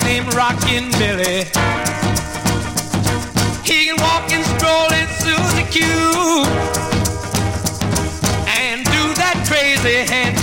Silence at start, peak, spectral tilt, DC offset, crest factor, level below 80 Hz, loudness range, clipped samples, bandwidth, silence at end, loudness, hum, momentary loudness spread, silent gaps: 0 s; 0 dBFS; -3.5 dB/octave; under 0.1%; 16 dB; -32 dBFS; 2 LU; under 0.1%; 17 kHz; 0 s; -16 LUFS; none; 6 LU; none